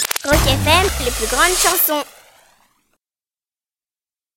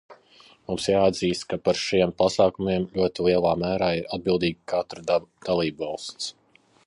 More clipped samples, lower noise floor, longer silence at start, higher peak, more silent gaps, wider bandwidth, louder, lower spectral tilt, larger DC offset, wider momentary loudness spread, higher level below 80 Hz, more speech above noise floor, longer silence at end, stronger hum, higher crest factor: neither; first, under -90 dBFS vs -54 dBFS; about the same, 0 s vs 0.1 s; first, 0 dBFS vs -8 dBFS; neither; first, 17 kHz vs 11.5 kHz; first, -15 LUFS vs -24 LUFS; second, -2.5 dB/octave vs -5 dB/octave; neither; second, 7 LU vs 11 LU; first, -30 dBFS vs -52 dBFS; first, over 74 dB vs 31 dB; first, 2.35 s vs 0.55 s; neither; about the same, 20 dB vs 18 dB